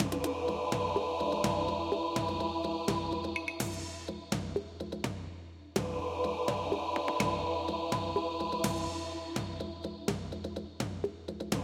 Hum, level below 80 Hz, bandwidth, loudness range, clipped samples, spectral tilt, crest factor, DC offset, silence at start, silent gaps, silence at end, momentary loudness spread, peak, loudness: none; -52 dBFS; 16 kHz; 4 LU; under 0.1%; -5 dB/octave; 20 dB; under 0.1%; 0 s; none; 0 s; 8 LU; -14 dBFS; -34 LUFS